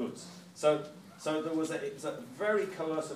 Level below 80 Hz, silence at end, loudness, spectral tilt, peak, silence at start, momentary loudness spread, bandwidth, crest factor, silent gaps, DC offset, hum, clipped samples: -84 dBFS; 0 s; -34 LUFS; -4.5 dB/octave; -14 dBFS; 0 s; 12 LU; 15.5 kHz; 20 dB; none; under 0.1%; none; under 0.1%